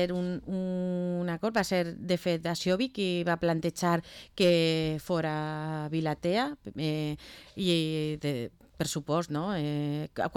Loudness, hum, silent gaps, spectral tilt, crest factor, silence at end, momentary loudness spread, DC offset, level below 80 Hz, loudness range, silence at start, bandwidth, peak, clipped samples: -30 LUFS; none; none; -5.5 dB/octave; 16 dB; 0 s; 7 LU; under 0.1%; -58 dBFS; 3 LU; 0 s; 17.5 kHz; -14 dBFS; under 0.1%